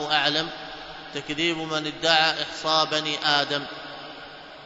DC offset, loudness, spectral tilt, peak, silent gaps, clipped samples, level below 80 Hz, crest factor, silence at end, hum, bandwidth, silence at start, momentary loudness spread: under 0.1%; -23 LUFS; -2.5 dB/octave; -4 dBFS; none; under 0.1%; -60 dBFS; 22 dB; 0 s; none; 8 kHz; 0 s; 18 LU